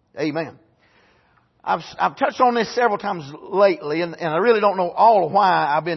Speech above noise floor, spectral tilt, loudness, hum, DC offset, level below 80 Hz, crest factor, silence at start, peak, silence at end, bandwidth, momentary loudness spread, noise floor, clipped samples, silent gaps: 41 dB; -6 dB/octave; -19 LUFS; none; under 0.1%; -68 dBFS; 16 dB; 0.15 s; -4 dBFS; 0 s; 6.2 kHz; 11 LU; -60 dBFS; under 0.1%; none